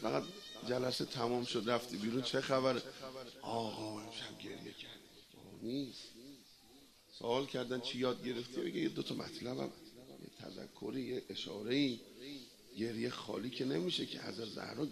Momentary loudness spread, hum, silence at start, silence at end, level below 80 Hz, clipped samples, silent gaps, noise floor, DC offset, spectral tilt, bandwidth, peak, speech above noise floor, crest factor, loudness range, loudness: 17 LU; none; 0 s; 0 s; -76 dBFS; under 0.1%; none; -63 dBFS; under 0.1%; -5 dB/octave; 13.5 kHz; -18 dBFS; 23 dB; 22 dB; 8 LU; -40 LUFS